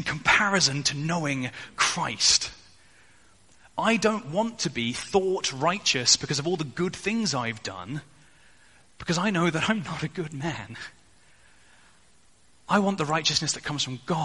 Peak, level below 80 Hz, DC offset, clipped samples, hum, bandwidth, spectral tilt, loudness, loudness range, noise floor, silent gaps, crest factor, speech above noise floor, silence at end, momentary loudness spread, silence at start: -6 dBFS; -58 dBFS; 0.1%; under 0.1%; none; 11.5 kHz; -3 dB/octave; -25 LUFS; 6 LU; -61 dBFS; none; 22 dB; 35 dB; 0 s; 14 LU; 0 s